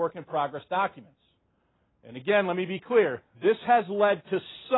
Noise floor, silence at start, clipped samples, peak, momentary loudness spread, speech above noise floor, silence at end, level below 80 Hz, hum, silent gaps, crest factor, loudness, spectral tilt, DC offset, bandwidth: -71 dBFS; 0 s; under 0.1%; -10 dBFS; 9 LU; 44 dB; 0 s; -72 dBFS; none; none; 18 dB; -27 LUFS; -9.5 dB/octave; under 0.1%; 4.1 kHz